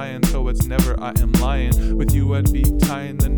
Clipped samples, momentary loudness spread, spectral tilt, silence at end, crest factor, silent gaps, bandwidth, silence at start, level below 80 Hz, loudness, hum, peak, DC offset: under 0.1%; 3 LU; -6 dB/octave; 0 s; 14 dB; none; over 20 kHz; 0 s; -20 dBFS; -19 LUFS; none; -2 dBFS; 0.9%